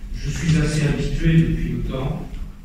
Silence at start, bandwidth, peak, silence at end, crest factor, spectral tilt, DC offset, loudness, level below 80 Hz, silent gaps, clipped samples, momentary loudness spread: 0 s; 10.5 kHz; -6 dBFS; 0 s; 16 dB; -6.5 dB/octave; 0.1%; -21 LUFS; -28 dBFS; none; under 0.1%; 11 LU